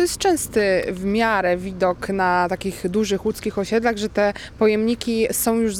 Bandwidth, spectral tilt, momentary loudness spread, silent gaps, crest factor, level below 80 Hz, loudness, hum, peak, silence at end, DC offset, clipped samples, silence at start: 18 kHz; -4 dB/octave; 4 LU; none; 16 dB; -44 dBFS; -21 LUFS; none; -6 dBFS; 0 s; under 0.1%; under 0.1%; 0 s